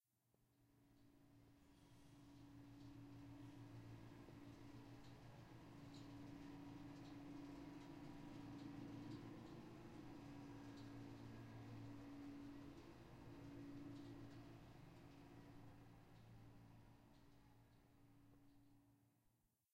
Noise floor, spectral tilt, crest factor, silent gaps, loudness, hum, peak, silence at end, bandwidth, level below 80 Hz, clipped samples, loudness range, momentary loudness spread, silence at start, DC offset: -84 dBFS; -7 dB/octave; 16 dB; none; -60 LUFS; none; -44 dBFS; 0 s; 15.5 kHz; -74 dBFS; under 0.1%; 9 LU; 9 LU; 0 s; under 0.1%